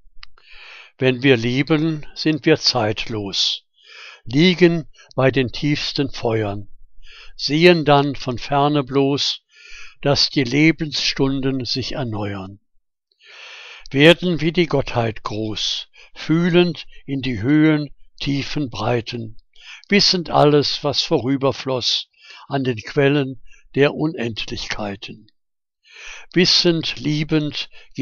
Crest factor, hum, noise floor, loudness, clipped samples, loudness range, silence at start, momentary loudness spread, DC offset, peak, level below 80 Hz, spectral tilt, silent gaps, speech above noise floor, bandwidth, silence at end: 20 dB; none; -73 dBFS; -18 LUFS; under 0.1%; 3 LU; 0.15 s; 18 LU; under 0.1%; 0 dBFS; -42 dBFS; -5 dB/octave; none; 55 dB; 10 kHz; 0 s